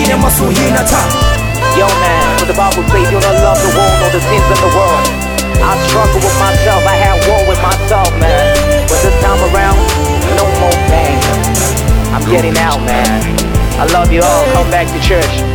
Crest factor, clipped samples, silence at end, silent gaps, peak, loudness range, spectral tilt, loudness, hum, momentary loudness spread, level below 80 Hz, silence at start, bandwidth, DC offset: 10 dB; under 0.1%; 0 s; none; 0 dBFS; 1 LU; -4.5 dB/octave; -10 LUFS; none; 3 LU; -16 dBFS; 0 s; over 20 kHz; under 0.1%